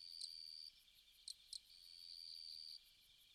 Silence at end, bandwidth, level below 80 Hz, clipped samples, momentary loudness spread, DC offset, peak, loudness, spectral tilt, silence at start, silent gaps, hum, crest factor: 0 s; 15 kHz; -84 dBFS; under 0.1%; 16 LU; under 0.1%; -36 dBFS; -54 LUFS; 3 dB/octave; 0 s; none; none; 22 dB